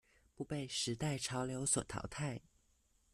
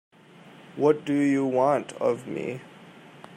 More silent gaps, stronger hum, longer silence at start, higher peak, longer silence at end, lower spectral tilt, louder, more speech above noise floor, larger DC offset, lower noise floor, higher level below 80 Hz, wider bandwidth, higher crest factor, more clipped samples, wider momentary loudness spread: neither; neither; about the same, 0.4 s vs 0.45 s; second, -20 dBFS vs -8 dBFS; first, 0.75 s vs 0 s; second, -3.5 dB/octave vs -7 dB/octave; second, -39 LUFS vs -25 LUFS; first, 35 dB vs 26 dB; neither; first, -75 dBFS vs -50 dBFS; first, -64 dBFS vs -76 dBFS; first, 13.5 kHz vs 10.5 kHz; about the same, 20 dB vs 18 dB; neither; second, 9 LU vs 12 LU